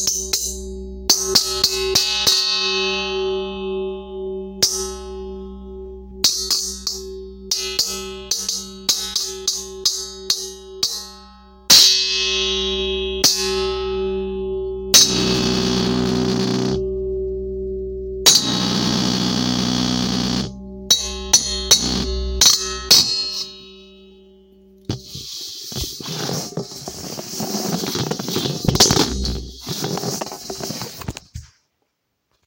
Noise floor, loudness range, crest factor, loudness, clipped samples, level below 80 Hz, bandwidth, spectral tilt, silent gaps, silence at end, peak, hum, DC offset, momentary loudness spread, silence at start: -72 dBFS; 9 LU; 20 dB; -18 LUFS; under 0.1%; -36 dBFS; 17 kHz; -2 dB/octave; none; 1 s; 0 dBFS; none; under 0.1%; 17 LU; 0 s